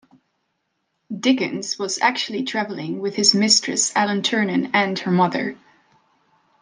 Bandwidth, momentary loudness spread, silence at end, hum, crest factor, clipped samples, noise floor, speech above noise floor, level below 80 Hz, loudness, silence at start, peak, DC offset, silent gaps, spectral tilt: 11 kHz; 10 LU; 1.05 s; none; 22 dB; under 0.1%; -73 dBFS; 53 dB; -74 dBFS; -19 LUFS; 1.1 s; 0 dBFS; under 0.1%; none; -3 dB/octave